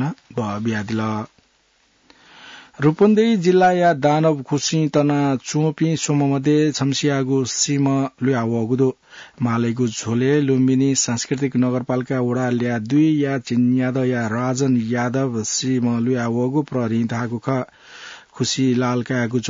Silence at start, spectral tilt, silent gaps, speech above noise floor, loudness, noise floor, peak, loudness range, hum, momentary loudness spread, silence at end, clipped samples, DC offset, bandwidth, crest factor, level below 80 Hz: 0 s; -5.5 dB/octave; none; 42 dB; -19 LUFS; -60 dBFS; -6 dBFS; 4 LU; none; 8 LU; 0 s; under 0.1%; under 0.1%; 7.8 kHz; 14 dB; -62 dBFS